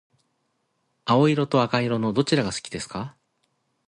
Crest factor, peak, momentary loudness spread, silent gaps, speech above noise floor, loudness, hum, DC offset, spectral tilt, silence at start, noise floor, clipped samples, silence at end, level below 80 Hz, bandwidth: 18 dB; -6 dBFS; 15 LU; none; 50 dB; -23 LUFS; none; under 0.1%; -5.5 dB/octave; 1.05 s; -73 dBFS; under 0.1%; 0.8 s; -58 dBFS; 11.5 kHz